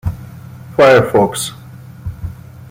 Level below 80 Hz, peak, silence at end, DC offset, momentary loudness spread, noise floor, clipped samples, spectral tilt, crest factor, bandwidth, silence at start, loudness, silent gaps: -38 dBFS; 0 dBFS; 0.05 s; under 0.1%; 25 LU; -33 dBFS; under 0.1%; -5 dB/octave; 16 dB; 16.5 kHz; 0.05 s; -13 LUFS; none